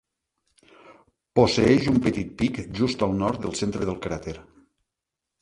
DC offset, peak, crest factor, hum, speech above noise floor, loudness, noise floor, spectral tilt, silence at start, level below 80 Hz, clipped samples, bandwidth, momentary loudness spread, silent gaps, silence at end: under 0.1%; -4 dBFS; 22 dB; none; 62 dB; -24 LUFS; -85 dBFS; -6 dB/octave; 0.9 s; -46 dBFS; under 0.1%; 11.5 kHz; 13 LU; none; 1 s